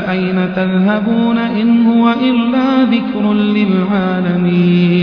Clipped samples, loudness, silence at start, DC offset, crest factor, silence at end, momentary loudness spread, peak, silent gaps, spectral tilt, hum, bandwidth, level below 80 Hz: under 0.1%; -13 LUFS; 0 s; under 0.1%; 12 dB; 0 s; 4 LU; 0 dBFS; none; -9.5 dB/octave; none; 5.4 kHz; -50 dBFS